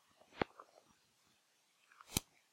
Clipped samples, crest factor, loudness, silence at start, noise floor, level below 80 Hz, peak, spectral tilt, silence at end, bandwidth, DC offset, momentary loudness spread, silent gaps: under 0.1%; 34 dB; -43 LUFS; 0.35 s; -76 dBFS; -64 dBFS; -16 dBFS; -3 dB/octave; 0.3 s; 16 kHz; under 0.1%; 22 LU; none